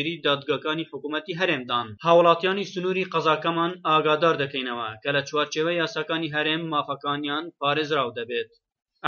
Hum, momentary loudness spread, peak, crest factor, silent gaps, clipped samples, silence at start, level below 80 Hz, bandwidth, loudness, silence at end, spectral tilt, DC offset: none; 10 LU; -4 dBFS; 22 dB; none; under 0.1%; 0 s; -72 dBFS; 7 kHz; -24 LUFS; 0 s; -2.5 dB/octave; under 0.1%